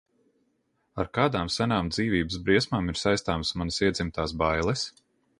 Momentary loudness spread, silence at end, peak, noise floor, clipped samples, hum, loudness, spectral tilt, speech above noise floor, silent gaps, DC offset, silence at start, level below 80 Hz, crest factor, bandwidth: 7 LU; 0.5 s; -8 dBFS; -73 dBFS; under 0.1%; none; -27 LUFS; -5 dB/octave; 46 dB; none; under 0.1%; 0.95 s; -44 dBFS; 20 dB; 11.5 kHz